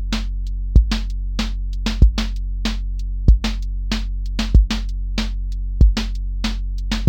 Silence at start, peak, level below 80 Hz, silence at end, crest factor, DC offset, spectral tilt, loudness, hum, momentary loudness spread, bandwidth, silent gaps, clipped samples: 0 s; 0 dBFS; -18 dBFS; 0 s; 18 dB; under 0.1%; -5.5 dB/octave; -22 LUFS; none; 10 LU; 8.8 kHz; none; under 0.1%